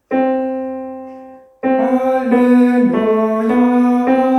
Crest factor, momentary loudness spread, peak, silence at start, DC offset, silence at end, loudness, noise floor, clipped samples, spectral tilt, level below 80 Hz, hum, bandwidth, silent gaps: 12 dB; 14 LU; -2 dBFS; 0.1 s; under 0.1%; 0 s; -14 LUFS; -37 dBFS; under 0.1%; -7.5 dB/octave; -56 dBFS; none; 6 kHz; none